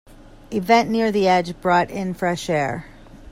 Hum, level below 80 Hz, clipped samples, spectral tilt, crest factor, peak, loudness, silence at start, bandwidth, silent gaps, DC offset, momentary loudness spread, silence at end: none; -48 dBFS; under 0.1%; -5.5 dB/octave; 18 dB; -2 dBFS; -20 LUFS; 0.5 s; 16 kHz; none; under 0.1%; 10 LU; 0 s